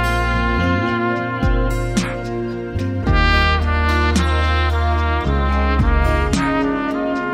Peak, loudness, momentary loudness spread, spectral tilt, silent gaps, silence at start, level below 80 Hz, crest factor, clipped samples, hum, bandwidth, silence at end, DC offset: -2 dBFS; -18 LUFS; 6 LU; -6 dB/octave; none; 0 s; -20 dBFS; 14 dB; under 0.1%; none; 12.5 kHz; 0 s; under 0.1%